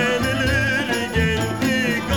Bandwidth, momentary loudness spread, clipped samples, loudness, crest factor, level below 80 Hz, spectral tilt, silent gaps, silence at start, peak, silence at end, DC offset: 19 kHz; 2 LU; under 0.1%; -20 LUFS; 14 dB; -34 dBFS; -5 dB/octave; none; 0 s; -8 dBFS; 0 s; 0.4%